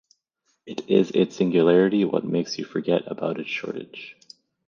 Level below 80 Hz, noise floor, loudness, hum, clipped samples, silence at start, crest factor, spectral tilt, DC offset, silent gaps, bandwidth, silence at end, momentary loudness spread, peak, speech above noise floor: -70 dBFS; -73 dBFS; -23 LUFS; none; under 0.1%; 0.65 s; 18 dB; -6.5 dB/octave; under 0.1%; none; 7.2 kHz; 0.55 s; 18 LU; -6 dBFS; 50 dB